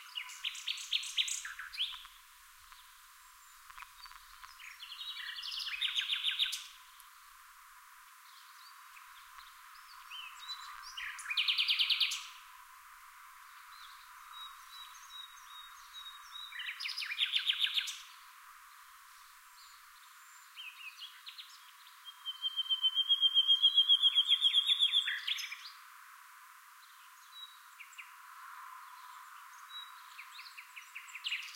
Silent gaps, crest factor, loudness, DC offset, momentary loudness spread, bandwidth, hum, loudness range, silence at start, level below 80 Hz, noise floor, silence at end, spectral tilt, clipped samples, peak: none; 22 dB; -31 LUFS; under 0.1%; 28 LU; 16 kHz; none; 23 LU; 0 s; -78 dBFS; -59 dBFS; 0 s; 7.5 dB/octave; under 0.1%; -18 dBFS